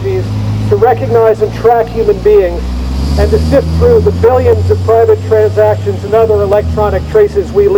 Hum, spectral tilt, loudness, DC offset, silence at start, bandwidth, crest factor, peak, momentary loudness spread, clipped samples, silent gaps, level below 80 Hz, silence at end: none; -8 dB/octave; -10 LUFS; under 0.1%; 0 s; 16 kHz; 8 dB; 0 dBFS; 7 LU; 0.7%; none; -20 dBFS; 0 s